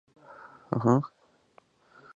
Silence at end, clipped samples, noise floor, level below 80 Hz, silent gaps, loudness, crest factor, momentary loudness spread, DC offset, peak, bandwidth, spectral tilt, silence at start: 1.1 s; under 0.1%; -62 dBFS; -70 dBFS; none; -27 LUFS; 24 dB; 25 LU; under 0.1%; -8 dBFS; 7.6 kHz; -9 dB/octave; 0.3 s